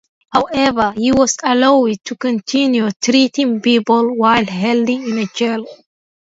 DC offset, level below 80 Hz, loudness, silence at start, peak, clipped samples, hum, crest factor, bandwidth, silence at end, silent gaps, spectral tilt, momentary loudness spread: under 0.1%; -50 dBFS; -15 LUFS; 0.3 s; 0 dBFS; under 0.1%; none; 14 dB; 8 kHz; 0.45 s; 2.96-3.00 s; -4 dB/octave; 7 LU